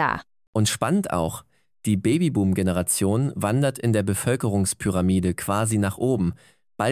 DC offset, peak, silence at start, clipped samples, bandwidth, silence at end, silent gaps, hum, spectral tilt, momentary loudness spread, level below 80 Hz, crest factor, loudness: under 0.1%; -8 dBFS; 0 s; under 0.1%; 16 kHz; 0 s; 0.47-0.53 s; none; -5.5 dB/octave; 6 LU; -42 dBFS; 16 dB; -23 LUFS